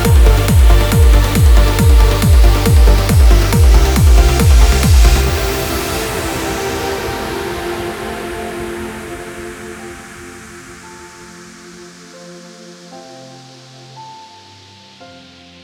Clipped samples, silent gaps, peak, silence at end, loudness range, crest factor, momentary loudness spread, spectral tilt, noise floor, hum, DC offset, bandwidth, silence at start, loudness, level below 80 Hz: under 0.1%; none; 0 dBFS; 1.5 s; 24 LU; 12 dB; 24 LU; -5.5 dB/octave; -40 dBFS; none; under 0.1%; over 20 kHz; 0 s; -13 LUFS; -14 dBFS